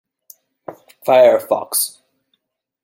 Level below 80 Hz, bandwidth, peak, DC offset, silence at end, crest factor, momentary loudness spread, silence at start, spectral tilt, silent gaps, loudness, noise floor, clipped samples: -70 dBFS; 16.5 kHz; -2 dBFS; under 0.1%; 0.95 s; 18 dB; 26 LU; 0.7 s; -2 dB/octave; none; -15 LUFS; -70 dBFS; under 0.1%